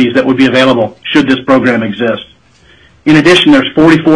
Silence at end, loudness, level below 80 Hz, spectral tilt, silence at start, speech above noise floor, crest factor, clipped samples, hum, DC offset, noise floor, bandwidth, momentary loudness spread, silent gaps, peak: 0 s; -8 LUFS; -42 dBFS; -5.5 dB/octave; 0 s; 36 dB; 8 dB; 0.6%; none; under 0.1%; -44 dBFS; 10.5 kHz; 9 LU; none; 0 dBFS